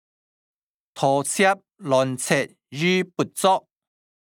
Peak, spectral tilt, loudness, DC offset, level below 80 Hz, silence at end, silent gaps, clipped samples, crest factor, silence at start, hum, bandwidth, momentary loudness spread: -4 dBFS; -4 dB/octave; -22 LUFS; under 0.1%; -74 dBFS; 0.65 s; none; under 0.1%; 20 dB; 0.95 s; none; 19 kHz; 6 LU